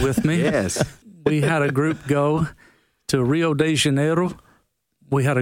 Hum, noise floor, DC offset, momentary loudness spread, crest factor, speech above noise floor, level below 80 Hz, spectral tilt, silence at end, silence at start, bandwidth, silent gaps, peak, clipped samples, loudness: none; -64 dBFS; under 0.1%; 8 LU; 16 dB; 44 dB; -48 dBFS; -5.5 dB/octave; 0 s; 0 s; 16.5 kHz; none; -4 dBFS; under 0.1%; -21 LUFS